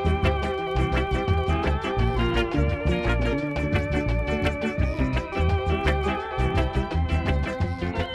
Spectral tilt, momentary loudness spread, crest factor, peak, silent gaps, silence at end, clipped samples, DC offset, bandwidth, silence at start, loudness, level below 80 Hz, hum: -7 dB/octave; 3 LU; 14 dB; -10 dBFS; none; 0 s; under 0.1%; under 0.1%; 10 kHz; 0 s; -25 LUFS; -28 dBFS; none